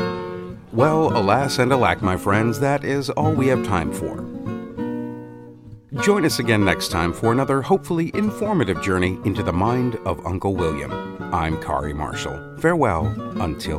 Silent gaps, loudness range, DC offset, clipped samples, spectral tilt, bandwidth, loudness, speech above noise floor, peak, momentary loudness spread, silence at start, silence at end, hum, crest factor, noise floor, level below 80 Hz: none; 4 LU; under 0.1%; under 0.1%; -6 dB/octave; 16 kHz; -21 LUFS; 21 dB; -2 dBFS; 12 LU; 0 s; 0 s; none; 20 dB; -41 dBFS; -42 dBFS